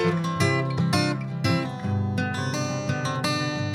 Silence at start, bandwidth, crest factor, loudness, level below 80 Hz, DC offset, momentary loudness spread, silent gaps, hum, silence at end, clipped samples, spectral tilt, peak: 0 s; 14.5 kHz; 16 dB; -25 LUFS; -58 dBFS; under 0.1%; 4 LU; none; none; 0 s; under 0.1%; -5.5 dB/octave; -8 dBFS